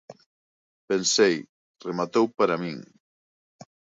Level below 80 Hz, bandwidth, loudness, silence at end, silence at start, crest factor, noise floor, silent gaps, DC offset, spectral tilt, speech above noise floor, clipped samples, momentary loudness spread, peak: -72 dBFS; 8 kHz; -24 LUFS; 1.15 s; 0.1 s; 20 dB; under -90 dBFS; 0.26-0.88 s, 1.49-1.74 s; under 0.1%; -3.5 dB/octave; over 66 dB; under 0.1%; 15 LU; -8 dBFS